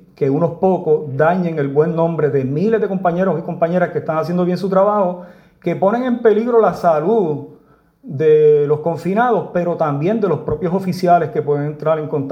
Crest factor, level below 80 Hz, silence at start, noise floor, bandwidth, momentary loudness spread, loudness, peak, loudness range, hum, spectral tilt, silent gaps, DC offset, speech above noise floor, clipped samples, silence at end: 16 dB; -52 dBFS; 0.2 s; -50 dBFS; 12 kHz; 6 LU; -16 LUFS; 0 dBFS; 2 LU; none; -9 dB/octave; none; under 0.1%; 35 dB; under 0.1%; 0 s